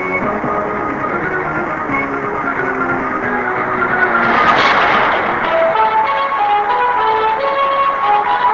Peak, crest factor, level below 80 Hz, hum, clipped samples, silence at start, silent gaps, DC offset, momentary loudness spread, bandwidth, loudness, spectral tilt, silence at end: 0 dBFS; 14 dB; -44 dBFS; none; under 0.1%; 0 s; none; 0.1%; 7 LU; 7.6 kHz; -14 LUFS; -5.5 dB/octave; 0 s